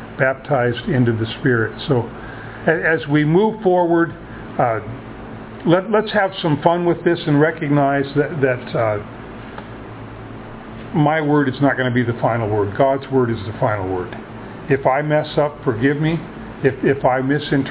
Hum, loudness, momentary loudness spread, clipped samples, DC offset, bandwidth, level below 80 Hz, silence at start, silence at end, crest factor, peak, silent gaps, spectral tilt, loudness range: none; -18 LUFS; 17 LU; under 0.1%; under 0.1%; 4 kHz; -46 dBFS; 0 s; 0 s; 18 dB; 0 dBFS; none; -11 dB/octave; 3 LU